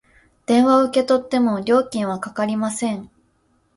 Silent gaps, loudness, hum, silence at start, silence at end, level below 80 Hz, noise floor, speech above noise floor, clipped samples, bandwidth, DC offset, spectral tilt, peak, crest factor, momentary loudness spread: none; -19 LUFS; none; 0.5 s; 0.7 s; -60 dBFS; -63 dBFS; 44 dB; under 0.1%; 11.5 kHz; under 0.1%; -5 dB/octave; -6 dBFS; 14 dB; 10 LU